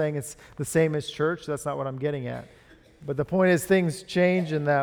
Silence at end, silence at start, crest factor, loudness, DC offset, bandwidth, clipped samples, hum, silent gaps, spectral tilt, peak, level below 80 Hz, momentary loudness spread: 0 s; 0 s; 16 dB; -26 LUFS; under 0.1%; 19 kHz; under 0.1%; none; none; -6 dB/octave; -8 dBFS; -58 dBFS; 13 LU